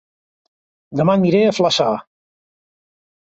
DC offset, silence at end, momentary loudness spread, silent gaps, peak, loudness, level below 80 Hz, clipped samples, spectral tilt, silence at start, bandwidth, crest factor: under 0.1%; 1.25 s; 11 LU; none; -2 dBFS; -16 LUFS; -60 dBFS; under 0.1%; -5.5 dB/octave; 0.9 s; 8 kHz; 18 dB